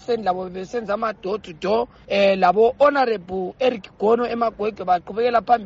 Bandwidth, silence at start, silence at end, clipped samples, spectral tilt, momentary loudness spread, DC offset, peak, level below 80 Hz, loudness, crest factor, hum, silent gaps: 7.6 kHz; 0.1 s; 0 s; under 0.1%; -3.5 dB/octave; 11 LU; under 0.1%; -6 dBFS; -54 dBFS; -21 LUFS; 16 dB; none; none